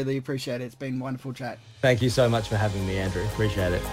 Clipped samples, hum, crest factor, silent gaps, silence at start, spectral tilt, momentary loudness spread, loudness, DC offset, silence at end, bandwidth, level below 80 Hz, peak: under 0.1%; none; 18 dB; none; 0 s; -6 dB/octave; 12 LU; -26 LUFS; under 0.1%; 0 s; 16 kHz; -42 dBFS; -8 dBFS